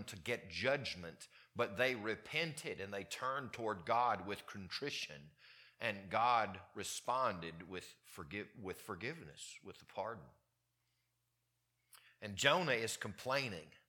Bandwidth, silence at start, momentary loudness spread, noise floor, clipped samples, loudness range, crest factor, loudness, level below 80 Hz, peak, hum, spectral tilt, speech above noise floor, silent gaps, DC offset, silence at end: 19 kHz; 0 s; 17 LU; -84 dBFS; under 0.1%; 10 LU; 28 dB; -40 LUFS; -76 dBFS; -14 dBFS; none; -3.5 dB/octave; 43 dB; none; under 0.1%; 0.1 s